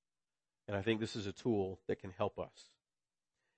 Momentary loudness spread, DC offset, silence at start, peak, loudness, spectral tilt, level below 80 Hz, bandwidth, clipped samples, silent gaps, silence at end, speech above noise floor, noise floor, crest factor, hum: 11 LU; under 0.1%; 0.7 s; -20 dBFS; -40 LUFS; -6 dB/octave; -74 dBFS; 8.4 kHz; under 0.1%; none; 0.95 s; over 51 dB; under -90 dBFS; 20 dB; none